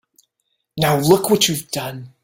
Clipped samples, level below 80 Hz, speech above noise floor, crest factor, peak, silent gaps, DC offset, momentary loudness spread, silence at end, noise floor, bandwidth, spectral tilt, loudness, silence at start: under 0.1%; -54 dBFS; 55 dB; 20 dB; 0 dBFS; none; under 0.1%; 14 LU; 0.15 s; -73 dBFS; 17 kHz; -4 dB/octave; -17 LUFS; 0.75 s